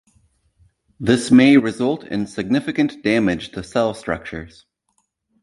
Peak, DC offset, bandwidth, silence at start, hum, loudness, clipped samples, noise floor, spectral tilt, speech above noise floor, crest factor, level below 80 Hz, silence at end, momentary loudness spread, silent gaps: -2 dBFS; under 0.1%; 11.5 kHz; 1 s; none; -18 LUFS; under 0.1%; -69 dBFS; -6 dB/octave; 51 dB; 18 dB; -50 dBFS; 0.95 s; 14 LU; none